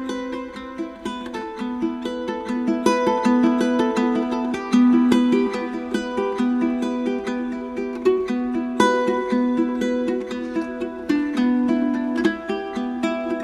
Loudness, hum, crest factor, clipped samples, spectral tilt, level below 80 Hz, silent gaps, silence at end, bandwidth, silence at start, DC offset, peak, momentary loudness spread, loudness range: -22 LUFS; none; 20 dB; under 0.1%; -5.5 dB/octave; -54 dBFS; none; 0 s; 11 kHz; 0 s; under 0.1%; -2 dBFS; 11 LU; 4 LU